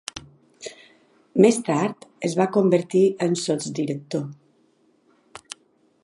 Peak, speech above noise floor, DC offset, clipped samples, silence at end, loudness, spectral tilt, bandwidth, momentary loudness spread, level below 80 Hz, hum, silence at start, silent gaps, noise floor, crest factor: -2 dBFS; 41 dB; under 0.1%; under 0.1%; 1.7 s; -22 LUFS; -5.5 dB/octave; 11.5 kHz; 22 LU; -66 dBFS; none; 0.15 s; none; -62 dBFS; 22 dB